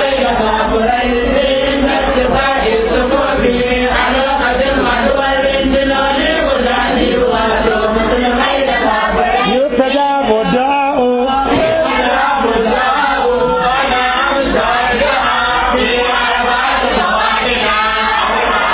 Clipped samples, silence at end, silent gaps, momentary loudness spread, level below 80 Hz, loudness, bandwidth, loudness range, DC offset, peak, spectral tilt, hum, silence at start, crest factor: under 0.1%; 0 s; none; 1 LU; -28 dBFS; -12 LUFS; 4 kHz; 0 LU; under 0.1%; 0 dBFS; -8.5 dB/octave; none; 0 s; 12 dB